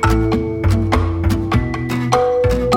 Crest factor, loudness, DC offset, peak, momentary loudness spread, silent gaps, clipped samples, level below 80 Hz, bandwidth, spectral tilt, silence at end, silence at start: 16 dB; -17 LUFS; under 0.1%; 0 dBFS; 3 LU; none; under 0.1%; -24 dBFS; 16.5 kHz; -7 dB/octave; 0 s; 0 s